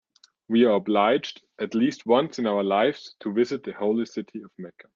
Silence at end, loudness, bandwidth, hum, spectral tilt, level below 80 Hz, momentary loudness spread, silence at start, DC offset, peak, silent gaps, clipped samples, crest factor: 0.25 s; -24 LUFS; 7.4 kHz; none; -6 dB/octave; -72 dBFS; 16 LU; 0.5 s; under 0.1%; -6 dBFS; none; under 0.1%; 18 dB